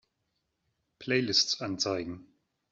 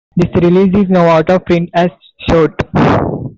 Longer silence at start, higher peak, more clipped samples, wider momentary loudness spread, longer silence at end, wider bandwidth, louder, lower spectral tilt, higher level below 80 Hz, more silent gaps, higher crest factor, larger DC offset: first, 1 s vs 0.15 s; second, -10 dBFS vs -2 dBFS; neither; first, 18 LU vs 5 LU; first, 0.5 s vs 0.05 s; about the same, 8 kHz vs 7.4 kHz; second, -28 LUFS vs -11 LUFS; second, -3 dB/octave vs -8.5 dB/octave; second, -70 dBFS vs -32 dBFS; neither; first, 24 dB vs 10 dB; neither